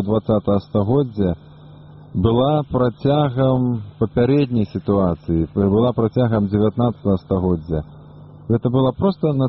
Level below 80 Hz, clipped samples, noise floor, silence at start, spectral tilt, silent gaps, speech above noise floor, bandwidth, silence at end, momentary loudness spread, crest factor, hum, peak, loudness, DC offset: -40 dBFS; under 0.1%; -41 dBFS; 0 s; -8.5 dB/octave; none; 23 dB; 5.8 kHz; 0 s; 6 LU; 14 dB; none; -4 dBFS; -19 LUFS; under 0.1%